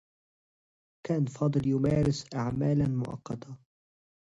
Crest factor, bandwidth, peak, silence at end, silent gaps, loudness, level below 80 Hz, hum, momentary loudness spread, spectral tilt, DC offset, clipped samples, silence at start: 16 dB; 8 kHz; -14 dBFS; 0.8 s; none; -29 LUFS; -54 dBFS; none; 14 LU; -8 dB/octave; under 0.1%; under 0.1%; 1.05 s